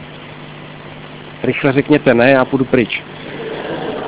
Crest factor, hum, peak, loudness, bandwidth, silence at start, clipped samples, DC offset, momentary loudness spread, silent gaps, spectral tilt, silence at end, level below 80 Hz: 16 dB; none; 0 dBFS; -14 LUFS; 4 kHz; 0 s; under 0.1%; under 0.1%; 22 LU; none; -10.5 dB/octave; 0 s; -48 dBFS